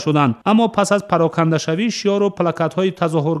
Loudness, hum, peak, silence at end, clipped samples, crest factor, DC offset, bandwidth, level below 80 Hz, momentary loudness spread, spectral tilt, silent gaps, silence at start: -17 LUFS; none; -2 dBFS; 0 s; under 0.1%; 16 dB; under 0.1%; 12 kHz; -60 dBFS; 4 LU; -6 dB/octave; none; 0 s